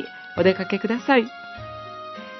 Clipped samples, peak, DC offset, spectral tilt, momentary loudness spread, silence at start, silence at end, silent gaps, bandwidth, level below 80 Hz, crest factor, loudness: under 0.1%; -4 dBFS; under 0.1%; -6.5 dB/octave; 16 LU; 0 s; 0 s; none; 6.2 kHz; -60 dBFS; 20 dB; -22 LUFS